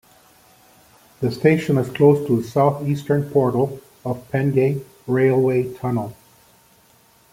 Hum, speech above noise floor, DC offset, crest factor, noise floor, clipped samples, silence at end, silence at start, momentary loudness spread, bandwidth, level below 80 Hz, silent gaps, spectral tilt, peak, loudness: none; 36 dB; under 0.1%; 18 dB; -55 dBFS; under 0.1%; 1.2 s; 1.2 s; 11 LU; 16 kHz; -58 dBFS; none; -8 dB/octave; -2 dBFS; -20 LUFS